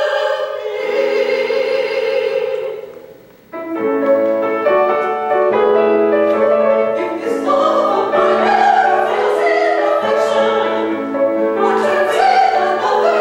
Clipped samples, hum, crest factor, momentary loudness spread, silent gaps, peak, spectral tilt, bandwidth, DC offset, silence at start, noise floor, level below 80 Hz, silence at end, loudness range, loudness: under 0.1%; none; 12 dB; 7 LU; none; -2 dBFS; -4.5 dB/octave; 16.5 kHz; under 0.1%; 0 s; -40 dBFS; -62 dBFS; 0 s; 5 LU; -15 LUFS